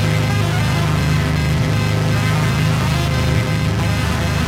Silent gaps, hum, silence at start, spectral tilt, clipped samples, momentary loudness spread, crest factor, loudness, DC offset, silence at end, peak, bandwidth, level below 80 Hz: none; none; 0 s; -5.5 dB/octave; under 0.1%; 2 LU; 12 dB; -17 LUFS; under 0.1%; 0 s; -4 dBFS; 16 kHz; -28 dBFS